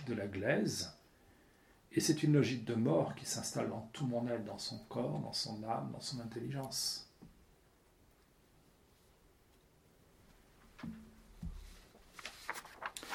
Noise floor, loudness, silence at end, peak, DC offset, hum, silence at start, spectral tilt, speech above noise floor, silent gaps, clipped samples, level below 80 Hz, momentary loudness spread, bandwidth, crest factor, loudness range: -68 dBFS; -38 LUFS; 0 s; -18 dBFS; under 0.1%; none; 0 s; -4.5 dB/octave; 31 dB; none; under 0.1%; -62 dBFS; 18 LU; 17 kHz; 22 dB; 20 LU